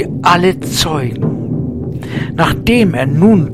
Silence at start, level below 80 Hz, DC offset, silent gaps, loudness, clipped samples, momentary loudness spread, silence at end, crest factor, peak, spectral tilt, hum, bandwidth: 0 s; -32 dBFS; 0.9%; none; -13 LUFS; 0.2%; 10 LU; 0 s; 12 dB; 0 dBFS; -5.5 dB/octave; none; 15.5 kHz